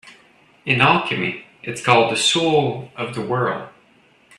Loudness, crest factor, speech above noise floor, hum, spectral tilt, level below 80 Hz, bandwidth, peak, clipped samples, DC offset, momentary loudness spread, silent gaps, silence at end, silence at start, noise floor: -18 LUFS; 20 dB; 36 dB; none; -4 dB/octave; -58 dBFS; 13 kHz; 0 dBFS; under 0.1%; under 0.1%; 15 LU; none; 0.7 s; 0.05 s; -55 dBFS